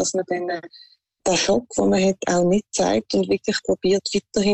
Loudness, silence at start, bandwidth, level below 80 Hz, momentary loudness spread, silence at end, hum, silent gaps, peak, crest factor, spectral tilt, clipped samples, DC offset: -21 LUFS; 0 s; 8.8 kHz; -52 dBFS; 7 LU; 0 s; none; none; -10 dBFS; 12 dB; -4 dB/octave; under 0.1%; under 0.1%